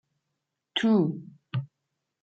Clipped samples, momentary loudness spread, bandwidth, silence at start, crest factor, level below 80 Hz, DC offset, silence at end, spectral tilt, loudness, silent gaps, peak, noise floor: under 0.1%; 16 LU; 7.8 kHz; 0.75 s; 18 dB; -78 dBFS; under 0.1%; 0.55 s; -7 dB/octave; -28 LUFS; none; -12 dBFS; -83 dBFS